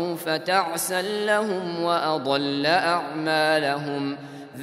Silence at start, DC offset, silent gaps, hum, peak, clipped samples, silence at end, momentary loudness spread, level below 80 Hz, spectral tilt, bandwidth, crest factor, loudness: 0 s; under 0.1%; none; none; -6 dBFS; under 0.1%; 0 s; 7 LU; -76 dBFS; -3.5 dB/octave; 16 kHz; 18 dB; -23 LUFS